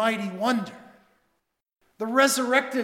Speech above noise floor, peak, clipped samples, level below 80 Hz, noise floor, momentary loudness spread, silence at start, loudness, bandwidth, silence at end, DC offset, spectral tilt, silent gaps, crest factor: 51 dB; -6 dBFS; under 0.1%; -78 dBFS; -74 dBFS; 12 LU; 0 s; -24 LUFS; 17 kHz; 0 s; under 0.1%; -3 dB/octave; none; 20 dB